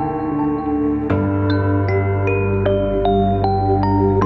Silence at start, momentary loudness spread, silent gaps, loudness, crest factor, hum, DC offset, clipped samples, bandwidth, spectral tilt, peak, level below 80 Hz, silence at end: 0 s; 3 LU; none; -18 LUFS; 12 dB; 50 Hz at -35 dBFS; under 0.1%; under 0.1%; 5.6 kHz; -10 dB/octave; -4 dBFS; -32 dBFS; 0 s